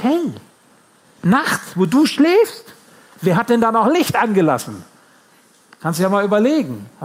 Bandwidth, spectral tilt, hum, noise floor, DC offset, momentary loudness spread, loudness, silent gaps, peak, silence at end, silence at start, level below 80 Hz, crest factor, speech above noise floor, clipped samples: 16 kHz; -5.5 dB/octave; none; -52 dBFS; under 0.1%; 13 LU; -17 LUFS; none; -4 dBFS; 0 s; 0 s; -62 dBFS; 14 dB; 36 dB; under 0.1%